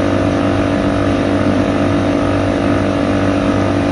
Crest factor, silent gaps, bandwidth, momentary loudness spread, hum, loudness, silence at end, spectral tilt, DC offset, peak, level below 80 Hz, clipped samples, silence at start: 12 dB; none; 11 kHz; 1 LU; none; -15 LUFS; 0 s; -7 dB/octave; under 0.1%; -2 dBFS; -30 dBFS; under 0.1%; 0 s